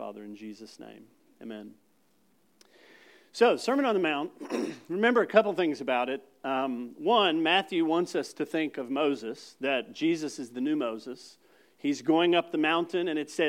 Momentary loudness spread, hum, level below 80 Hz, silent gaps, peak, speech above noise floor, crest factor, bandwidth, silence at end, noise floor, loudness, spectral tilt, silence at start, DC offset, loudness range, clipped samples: 19 LU; none; under -90 dBFS; none; -6 dBFS; 40 dB; 22 dB; 15 kHz; 0 s; -69 dBFS; -28 LUFS; -4.5 dB/octave; 0 s; under 0.1%; 5 LU; under 0.1%